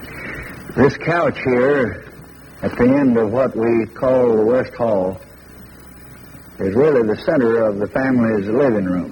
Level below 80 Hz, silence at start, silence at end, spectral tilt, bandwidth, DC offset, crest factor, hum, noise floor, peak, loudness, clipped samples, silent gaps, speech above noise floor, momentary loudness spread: -46 dBFS; 0 s; 0 s; -8.5 dB/octave; 16.5 kHz; under 0.1%; 16 dB; none; -40 dBFS; 0 dBFS; -17 LUFS; under 0.1%; none; 24 dB; 15 LU